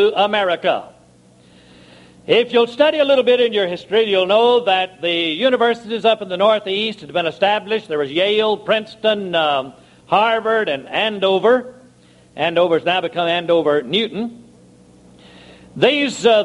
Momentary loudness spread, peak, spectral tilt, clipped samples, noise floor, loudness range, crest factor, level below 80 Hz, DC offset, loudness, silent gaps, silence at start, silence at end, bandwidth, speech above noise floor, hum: 7 LU; 0 dBFS; -4.5 dB/octave; under 0.1%; -49 dBFS; 4 LU; 18 dB; -62 dBFS; under 0.1%; -17 LUFS; none; 0 s; 0 s; 11 kHz; 33 dB; none